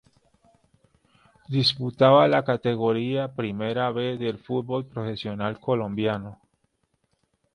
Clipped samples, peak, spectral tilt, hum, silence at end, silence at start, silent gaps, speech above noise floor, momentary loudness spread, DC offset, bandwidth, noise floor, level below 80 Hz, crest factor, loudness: under 0.1%; -4 dBFS; -7 dB/octave; none; 1.2 s; 1.5 s; none; 48 dB; 12 LU; under 0.1%; 10.5 kHz; -72 dBFS; -62 dBFS; 22 dB; -24 LUFS